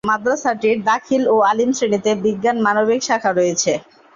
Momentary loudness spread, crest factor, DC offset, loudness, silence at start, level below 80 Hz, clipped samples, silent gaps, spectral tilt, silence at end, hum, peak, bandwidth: 4 LU; 14 dB; under 0.1%; -17 LUFS; 0.05 s; -58 dBFS; under 0.1%; none; -3.5 dB/octave; 0.35 s; none; -4 dBFS; 7.6 kHz